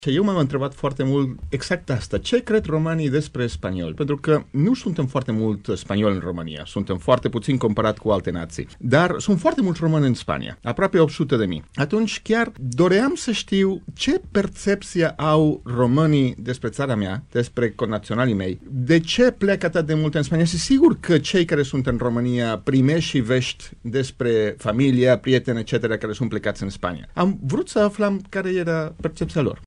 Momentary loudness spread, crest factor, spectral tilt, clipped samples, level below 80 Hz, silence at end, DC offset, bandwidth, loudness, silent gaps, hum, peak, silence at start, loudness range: 9 LU; 18 dB; -6.5 dB/octave; under 0.1%; -44 dBFS; 0 s; under 0.1%; 11 kHz; -21 LUFS; none; none; -2 dBFS; 0 s; 4 LU